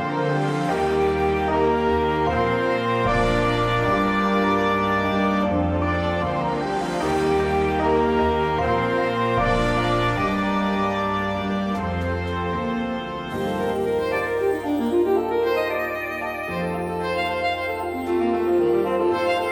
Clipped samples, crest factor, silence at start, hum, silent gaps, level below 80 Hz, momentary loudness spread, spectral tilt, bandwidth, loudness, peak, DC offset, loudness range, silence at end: under 0.1%; 14 dB; 0 s; none; none; -38 dBFS; 5 LU; -6.5 dB/octave; 19 kHz; -22 LUFS; -8 dBFS; under 0.1%; 4 LU; 0 s